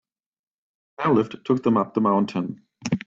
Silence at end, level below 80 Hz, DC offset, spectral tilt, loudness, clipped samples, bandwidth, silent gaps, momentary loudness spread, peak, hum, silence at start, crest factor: 0.1 s; -66 dBFS; under 0.1%; -7 dB/octave; -23 LUFS; under 0.1%; 7.6 kHz; none; 9 LU; -8 dBFS; none; 1 s; 16 dB